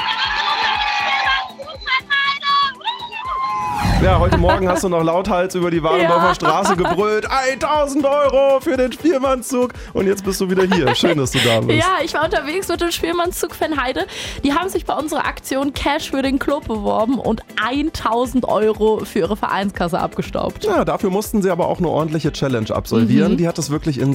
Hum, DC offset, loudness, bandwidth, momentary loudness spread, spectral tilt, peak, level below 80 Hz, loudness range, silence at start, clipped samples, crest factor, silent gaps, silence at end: none; under 0.1%; -18 LUFS; 16 kHz; 7 LU; -5 dB/octave; 0 dBFS; -34 dBFS; 4 LU; 0 s; under 0.1%; 16 dB; none; 0 s